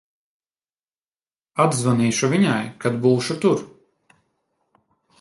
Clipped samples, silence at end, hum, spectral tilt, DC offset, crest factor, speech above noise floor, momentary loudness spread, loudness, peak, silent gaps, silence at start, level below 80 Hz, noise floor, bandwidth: under 0.1%; 1.55 s; none; -5.5 dB/octave; under 0.1%; 20 dB; over 71 dB; 6 LU; -20 LUFS; -4 dBFS; none; 1.55 s; -62 dBFS; under -90 dBFS; 11.5 kHz